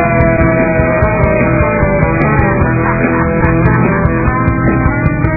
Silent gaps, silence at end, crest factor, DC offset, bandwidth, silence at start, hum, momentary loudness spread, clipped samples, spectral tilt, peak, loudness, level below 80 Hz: none; 0 s; 10 dB; under 0.1%; 2.7 kHz; 0 s; none; 2 LU; under 0.1%; -13 dB/octave; 0 dBFS; -11 LUFS; -20 dBFS